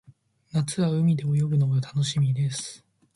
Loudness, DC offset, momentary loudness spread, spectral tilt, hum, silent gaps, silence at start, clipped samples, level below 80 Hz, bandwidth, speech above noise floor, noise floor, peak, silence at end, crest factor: -25 LUFS; under 0.1%; 7 LU; -6.5 dB/octave; none; none; 0.55 s; under 0.1%; -60 dBFS; 11.5 kHz; 33 dB; -57 dBFS; -14 dBFS; 0.4 s; 12 dB